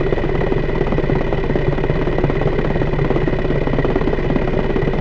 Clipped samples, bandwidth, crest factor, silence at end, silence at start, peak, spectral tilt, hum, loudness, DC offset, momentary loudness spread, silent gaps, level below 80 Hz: under 0.1%; 5.8 kHz; 16 dB; 0 s; 0 s; 0 dBFS; -9 dB/octave; none; -19 LUFS; under 0.1%; 1 LU; none; -22 dBFS